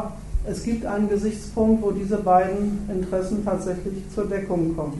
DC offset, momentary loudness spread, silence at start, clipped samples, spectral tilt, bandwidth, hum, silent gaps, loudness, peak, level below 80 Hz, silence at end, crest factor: under 0.1%; 10 LU; 0 s; under 0.1%; -7.5 dB/octave; 11.5 kHz; none; none; -24 LUFS; -6 dBFS; -36 dBFS; 0 s; 18 dB